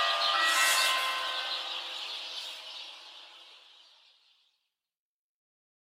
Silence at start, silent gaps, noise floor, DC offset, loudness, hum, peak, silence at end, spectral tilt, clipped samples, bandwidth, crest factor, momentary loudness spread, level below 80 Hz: 0 s; none; -82 dBFS; under 0.1%; -28 LUFS; none; -12 dBFS; 2.4 s; 4 dB/octave; under 0.1%; 16 kHz; 22 dB; 22 LU; under -90 dBFS